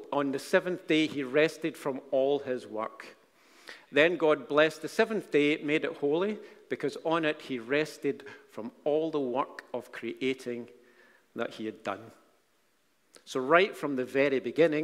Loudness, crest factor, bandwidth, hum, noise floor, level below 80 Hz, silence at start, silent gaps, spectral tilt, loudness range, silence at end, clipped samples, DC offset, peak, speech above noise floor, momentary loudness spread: -30 LUFS; 24 dB; 15 kHz; none; -72 dBFS; -78 dBFS; 0 s; none; -5 dB/octave; 9 LU; 0 s; under 0.1%; under 0.1%; -6 dBFS; 42 dB; 15 LU